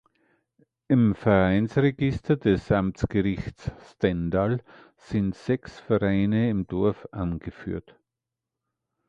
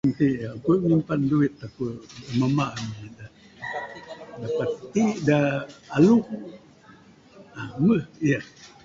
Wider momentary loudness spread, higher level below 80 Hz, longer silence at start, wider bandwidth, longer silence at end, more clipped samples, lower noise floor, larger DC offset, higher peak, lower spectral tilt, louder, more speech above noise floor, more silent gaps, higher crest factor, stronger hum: second, 13 LU vs 18 LU; first, -44 dBFS vs -56 dBFS; first, 0.9 s vs 0.05 s; about the same, 7.8 kHz vs 7.6 kHz; first, 1.3 s vs 0.2 s; neither; first, -87 dBFS vs -51 dBFS; neither; about the same, -6 dBFS vs -6 dBFS; about the same, -8.5 dB/octave vs -7.5 dB/octave; about the same, -25 LUFS vs -24 LUFS; first, 62 dB vs 28 dB; neither; about the same, 20 dB vs 18 dB; neither